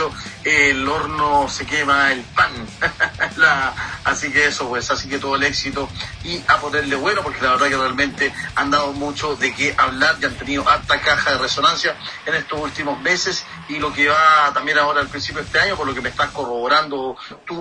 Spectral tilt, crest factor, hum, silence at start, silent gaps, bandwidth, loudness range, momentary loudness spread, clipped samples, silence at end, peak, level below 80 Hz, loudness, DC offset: -3 dB/octave; 18 dB; none; 0 s; none; 10.5 kHz; 2 LU; 10 LU; under 0.1%; 0 s; -2 dBFS; -44 dBFS; -18 LUFS; under 0.1%